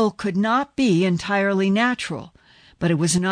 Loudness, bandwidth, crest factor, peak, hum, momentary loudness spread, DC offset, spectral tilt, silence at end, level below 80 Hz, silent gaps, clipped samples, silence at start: -21 LUFS; 10.5 kHz; 12 dB; -8 dBFS; none; 8 LU; under 0.1%; -5 dB/octave; 0 s; -54 dBFS; none; under 0.1%; 0 s